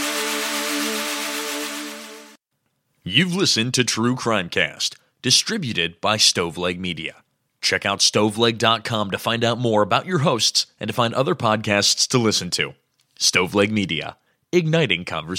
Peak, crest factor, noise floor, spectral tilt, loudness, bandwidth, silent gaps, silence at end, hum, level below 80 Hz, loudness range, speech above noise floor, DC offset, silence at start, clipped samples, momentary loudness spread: 0 dBFS; 20 dB; -73 dBFS; -3 dB/octave; -20 LUFS; 16.5 kHz; none; 0 s; none; -60 dBFS; 3 LU; 53 dB; under 0.1%; 0 s; under 0.1%; 10 LU